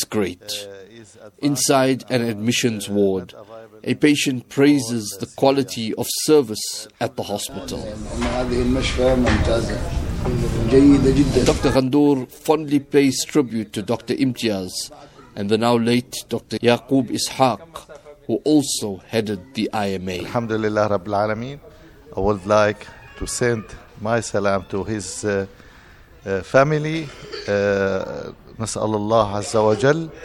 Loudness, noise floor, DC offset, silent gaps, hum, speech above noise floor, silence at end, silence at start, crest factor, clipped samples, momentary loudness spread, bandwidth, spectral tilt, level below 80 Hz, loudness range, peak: -20 LUFS; -46 dBFS; under 0.1%; none; none; 26 dB; 0 s; 0 s; 20 dB; under 0.1%; 13 LU; 17 kHz; -5 dB/octave; -36 dBFS; 5 LU; -2 dBFS